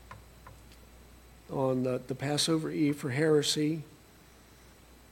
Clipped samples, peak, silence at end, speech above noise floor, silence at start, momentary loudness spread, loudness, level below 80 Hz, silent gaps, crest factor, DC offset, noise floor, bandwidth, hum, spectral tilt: under 0.1%; -14 dBFS; 1.15 s; 27 dB; 0.1 s; 16 LU; -30 LUFS; -60 dBFS; none; 18 dB; under 0.1%; -57 dBFS; 17 kHz; none; -4.5 dB/octave